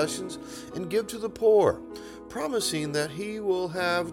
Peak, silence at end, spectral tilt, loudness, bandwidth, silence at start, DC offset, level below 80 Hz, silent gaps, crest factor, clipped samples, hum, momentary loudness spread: -10 dBFS; 0 s; -4 dB/octave; -27 LUFS; 17 kHz; 0 s; under 0.1%; -58 dBFS; none; 18 dB; under 0.1%; none; 16 LU